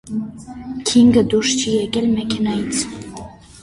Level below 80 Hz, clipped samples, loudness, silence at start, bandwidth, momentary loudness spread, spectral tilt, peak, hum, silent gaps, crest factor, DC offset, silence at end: -46 dBFS; under 0.1%; -17 LUFS; 0.05 s; 11.5 kHz; 21 LU; -4 dB/octave; -2 dBFS; none; none; 16 dB; under 0.1%; 0 s